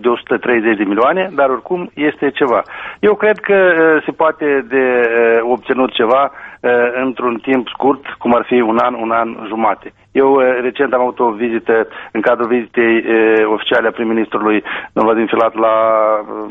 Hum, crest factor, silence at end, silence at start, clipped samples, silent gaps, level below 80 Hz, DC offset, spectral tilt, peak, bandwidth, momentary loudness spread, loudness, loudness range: none; 14 dB; 0 s; 0 s; under 0.1%; none; -56 dBFS; under 0.1%; -7.5 dB/octave; 0 dBFS; 4 kHz; 6 LU; -14 LUFS; 2 LU